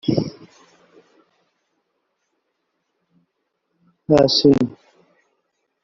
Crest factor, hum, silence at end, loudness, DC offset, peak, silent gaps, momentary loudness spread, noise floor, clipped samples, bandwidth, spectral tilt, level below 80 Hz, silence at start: 22 dB; none; 1.15 s; -17 LUFS; under 0.1%; -2 dBFS; none; 17 LU; -74 dBFS; under 0.1%; 7.4 kHz; -5.5 dB/octave; -54 dBFS; 0.05 s